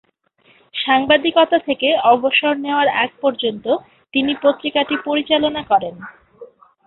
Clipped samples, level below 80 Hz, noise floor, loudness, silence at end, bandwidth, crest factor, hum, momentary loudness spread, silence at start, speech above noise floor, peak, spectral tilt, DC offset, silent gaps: under 0.1%; -58 dBFS; -56 dBFS; -17 LUFS; 0.4 s; 4.3 kHz; 16 dB; none; 9 LU; 0.75 s; 40 dB; -2 dBFS; -8.5 dB/octave; under 0.1%; none